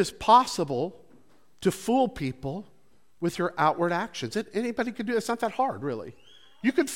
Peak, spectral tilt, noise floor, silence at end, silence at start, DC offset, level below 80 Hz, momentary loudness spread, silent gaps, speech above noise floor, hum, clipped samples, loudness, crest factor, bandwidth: -4 dBFS; -5 dB/octave; -62 dBFS; 0 s; 0 s; 0.2%; -58 dBFS; 14 LU; none; 35 dB; none; under 0.1%; -27 LUFS; 22 dB; 17 kHz